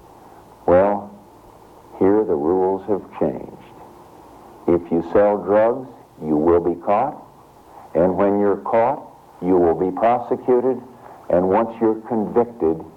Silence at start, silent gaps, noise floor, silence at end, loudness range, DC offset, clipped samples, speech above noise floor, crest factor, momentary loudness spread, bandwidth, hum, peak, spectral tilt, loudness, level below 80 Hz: 0.65 s; none; -46 dBFS; 0.05 s; 3 LU; under 0.1%; under 0.1%; 28 dB; 16 dB; 11 LU; 6 kHz; none; -4 dBFS; -9.5 dB/octave; -19 LUFS; -50 dBFS